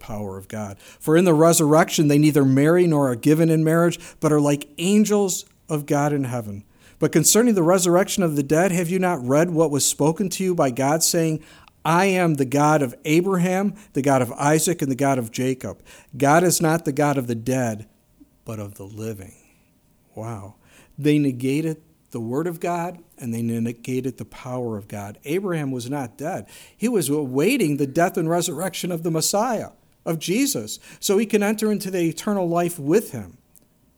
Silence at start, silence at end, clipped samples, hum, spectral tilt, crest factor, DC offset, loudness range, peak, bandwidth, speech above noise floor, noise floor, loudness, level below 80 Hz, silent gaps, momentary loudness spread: 0 s; 0.65 s; under 0.1%; none; -5 dB/octave; 20 dB; under 0.1%; 10 LU; -2 dBFS; over 20 kHz; 39 dB; -60 dBFS; -21 LUFS; -58 dBFS; none; 16 LU